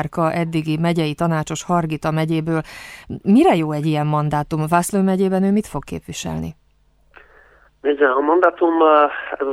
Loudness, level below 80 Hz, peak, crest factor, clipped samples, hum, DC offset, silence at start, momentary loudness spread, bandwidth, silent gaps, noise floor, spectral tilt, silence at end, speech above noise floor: -18 LUFS; -48 dBFS; -2 dBFS; 18 dB; under 0.1%; none; under 0.1%; 0 s; 14 LU; 15 kHz; none; -57 dBFS; -6.5 dB/octave; 0 s; 39 dB